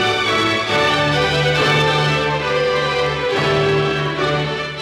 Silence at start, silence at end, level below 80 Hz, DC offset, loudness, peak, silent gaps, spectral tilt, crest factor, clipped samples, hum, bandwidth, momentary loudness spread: 0 s; 0 s; -40 dBFS; under 0.1%; -16 LUFS; -4 dBFS; none; -4.5 dB/octave; 14 dB; under 0.1%; none; 13.5 kHz; 4 LU